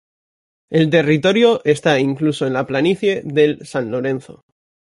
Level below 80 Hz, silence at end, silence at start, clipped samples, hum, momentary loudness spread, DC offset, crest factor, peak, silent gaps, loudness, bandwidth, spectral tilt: -58 dBFS; 0.75 s; 0.7 s; under 0.1%; none; 8 LU; under 0.1%; 16 dB; -2 dBFS; none; -17 LUFS; 11.5 kHz; -6 dB/octave